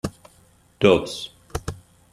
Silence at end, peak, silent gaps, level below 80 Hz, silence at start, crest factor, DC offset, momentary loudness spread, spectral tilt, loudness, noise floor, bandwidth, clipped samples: 0.35 s; -2 dBFS; none; -46 dBFS; 0.05 s; 22 dB; under 0.1%; 18 LU; -5.5 dB/octave; -23 LUFS; -56 dBFS; 15 kHz; under 0.1%